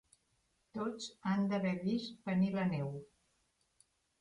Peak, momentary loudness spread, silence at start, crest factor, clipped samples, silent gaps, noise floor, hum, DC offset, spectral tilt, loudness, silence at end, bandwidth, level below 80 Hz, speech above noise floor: -24 dBFS; 9 LU; 0.75 s; 14 dB; under 0.1%; none; -78 dBFS; none; under 0.1%; -7 dB/octave; -37 LUFS; 1.15 s; 10.5 kHz; -74 dBFS; 42 dB